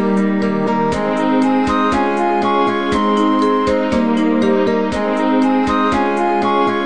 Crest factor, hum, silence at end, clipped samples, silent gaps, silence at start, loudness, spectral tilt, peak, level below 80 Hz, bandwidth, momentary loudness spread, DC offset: 12 dB; none; 0 s; under 0.1%; none; 0 s; -15 LUFS; -6.5 dB/octave; -4 dBFS; -40 dBFS; 9.8 kHz; 2 LU; 2%